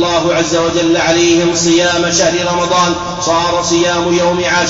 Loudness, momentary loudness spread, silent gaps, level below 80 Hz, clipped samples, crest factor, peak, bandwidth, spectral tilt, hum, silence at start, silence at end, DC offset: -12 LUFS; 3 LU; none; -40 dBFS; under 0.1%; 10 dB; -2 dBFS; 7.8 kHz; -3.5 dB/octave; none; 0 s; 0 s; under 0.1%